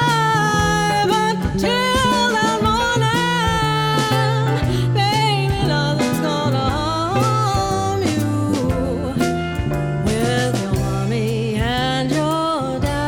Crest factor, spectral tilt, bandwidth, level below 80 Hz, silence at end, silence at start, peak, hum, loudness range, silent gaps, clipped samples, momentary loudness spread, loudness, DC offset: 12 dB; -5 dB/octave; 19.5 kHz; -34 dBFS; 0 s; 0 s; -6 dBFS; none; 3 LU; none; under 0.1%; 4 LU; -18 LUFS; under 0.1%